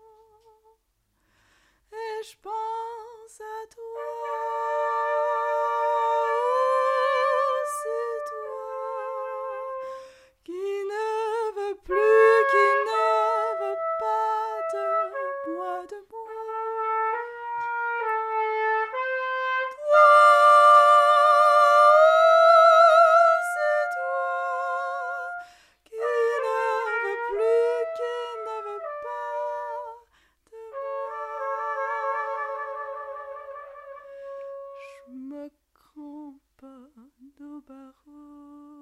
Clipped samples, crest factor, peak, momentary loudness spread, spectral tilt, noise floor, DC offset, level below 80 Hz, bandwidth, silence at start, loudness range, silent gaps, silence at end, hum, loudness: under 0.1%; 18 dB; -6 dBFS; 24 LU; -1 dB/octave; -72 dBFS; under 0.1%; -68 dBFS; 14.5 kHz; 1.9 s; 20 LU; none; 0 s; none; -22 LUFS